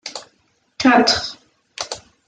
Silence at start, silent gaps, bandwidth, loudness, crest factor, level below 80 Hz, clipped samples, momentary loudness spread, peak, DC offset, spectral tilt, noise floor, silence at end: 0.05 s; none; 9.4 kHz; -17 LUFS; 18 dB; -54 dBFS; under 0.1%; 21 LU; -2 dBFS; under 0.1%; -2.5 dB/octave; -63 dBFS; 0.3 s